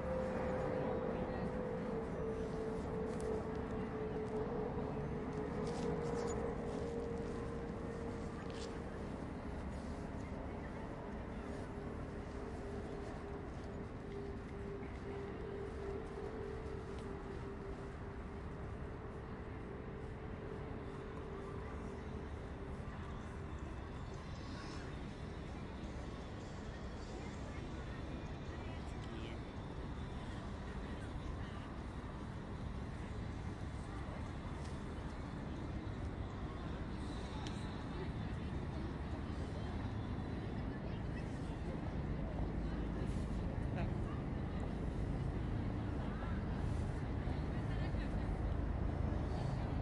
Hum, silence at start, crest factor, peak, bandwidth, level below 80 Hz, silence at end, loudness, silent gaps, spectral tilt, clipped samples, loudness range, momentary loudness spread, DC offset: none; 0 s; 14 dB; -28 dBFS; 11.5 kHz; -48 dBFS; 0 s; -44 LUFS; none; -7.5 dB/octave; under 0.1%; 6 LU; 7 LU; under 0.1%